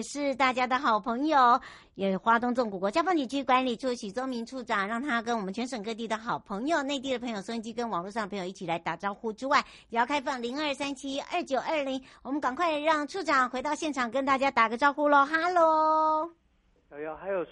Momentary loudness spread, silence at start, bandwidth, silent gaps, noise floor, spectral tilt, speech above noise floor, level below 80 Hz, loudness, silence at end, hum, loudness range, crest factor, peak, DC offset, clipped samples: 11 LU; 0 s; 11.5 kHz; none; -65 dBFS; -4 dB/octave; 37 dB; -66 dBFS; -28 LUFS; 0.05 s; none; 6 LU; 18 dB; -10 dBFS; under 0.1%; under 0.1%